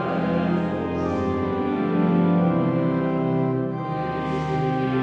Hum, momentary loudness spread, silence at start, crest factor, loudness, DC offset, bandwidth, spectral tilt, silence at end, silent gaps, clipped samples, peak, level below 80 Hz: none; 6 LU; 0 s; 12 dB; -23 LUFS; under 0.1%; 6.4 kHz; -9.5 dB/octave; 0 s; none; under 0.1%; -10 dBFS; -50 dBFS